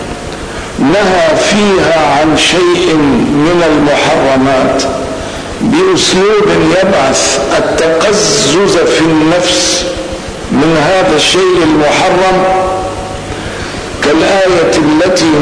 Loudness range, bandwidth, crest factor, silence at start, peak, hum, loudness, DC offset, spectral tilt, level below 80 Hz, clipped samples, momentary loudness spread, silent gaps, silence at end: 2 LU; 11 kHz; 8 dB; 0 s; 0 dBFS; none; -9 LUFS; 0.5%; -4 dB/octave; -32 dBFS; under 0.1%; 11 LU; none; 0 s